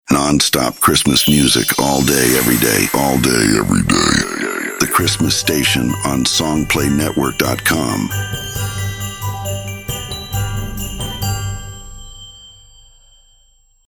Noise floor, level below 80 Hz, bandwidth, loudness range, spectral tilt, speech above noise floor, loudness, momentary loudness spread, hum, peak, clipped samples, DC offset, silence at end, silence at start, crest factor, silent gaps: -53 dBFS; -34 dBFS; over 20 kHz; 12 LU; -3.5 dB/octave; 38 dB; -15 LUFS; 12 LU; none; -2 dBFS; under 0.1%; under 0.1%; 1.35 s; 0.1 s; 16 dB; none